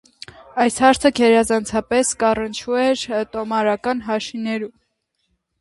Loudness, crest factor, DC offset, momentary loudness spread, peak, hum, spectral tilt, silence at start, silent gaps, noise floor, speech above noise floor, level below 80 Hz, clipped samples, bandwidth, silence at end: -19 LUFS; 18 dB; under 0.1%; 11 LU; 0 dBFS; none; -3.5 dB/octave; 0.4 s; none; -71 dBFS; 53 dB; -50 dBFS; under 0.1%; 11.5 kHz; 0.9 s